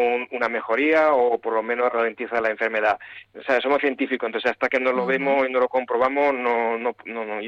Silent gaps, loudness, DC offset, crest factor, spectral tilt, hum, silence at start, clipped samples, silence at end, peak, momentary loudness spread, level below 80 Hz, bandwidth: none; -22 LUFS; under 0.1%; 14 dB; -5.5 dB/octave; none; 0 s; under 0.1%; 0 s; -8 dBFS; 6 LU; -66 dBFS; 7.2 kHz